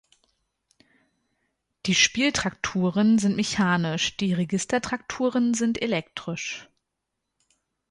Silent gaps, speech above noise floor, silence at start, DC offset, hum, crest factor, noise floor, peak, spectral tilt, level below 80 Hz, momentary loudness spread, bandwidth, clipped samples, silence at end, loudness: none; 58 dB; 1.85 s; under 0.1%; none; 22 dB; -82 dBFS; -4 dBFS; -4 dB/octave; -58 dBFS; 11 LU; 11.5 kHz; under 0.1%; 1.25 s; -24 LUFS